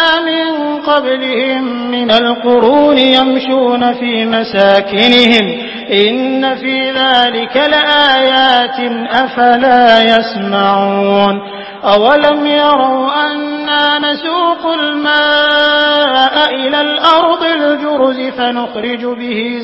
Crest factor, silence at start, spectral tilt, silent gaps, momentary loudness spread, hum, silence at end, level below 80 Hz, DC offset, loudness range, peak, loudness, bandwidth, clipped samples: 10 dB; 0 s; -5.5 dB/octave; none; 8 LU; none; 0 s; -52 dBFS; under 0.1%; 2 LU; 0 dBFS; -10 LUFS; 8 kHz; 0.3%